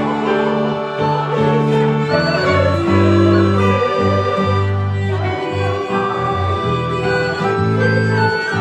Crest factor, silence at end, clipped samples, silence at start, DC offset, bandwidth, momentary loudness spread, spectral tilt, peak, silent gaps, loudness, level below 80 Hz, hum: 14 dB; 0 s; under 0.1%; 0 s; under 0.1%; 9.2 kHz; 6 LU; -7.5 dB/octave; -2 dBFS; none; -16 LUFS; -48 dBFS; none